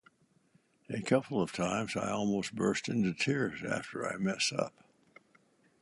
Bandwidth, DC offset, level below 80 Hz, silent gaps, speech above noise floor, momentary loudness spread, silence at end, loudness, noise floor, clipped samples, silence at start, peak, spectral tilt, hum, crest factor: 11.5 kHz; under 0.1%; -68 dBFS; none; 37 dB; 6 LU; 1.1 s; -33 LUFS; -69 dBFS; under 0.1%; 0.9 s; -14 dBFS; -4.5 dB/octave; none; 22 dB